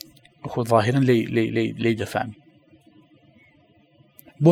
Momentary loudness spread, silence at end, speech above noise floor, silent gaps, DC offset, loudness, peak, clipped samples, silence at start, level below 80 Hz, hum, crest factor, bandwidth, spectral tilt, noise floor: 14 LU; 0 s; 36 dB; none; under 0.1%; -22 LUFS; -2 dBFS; under 0.1%; 0.45 s; -62 dBFS; none; 20 dB; 15.5 kHz; -7.5 dB/octave; -57 dBFS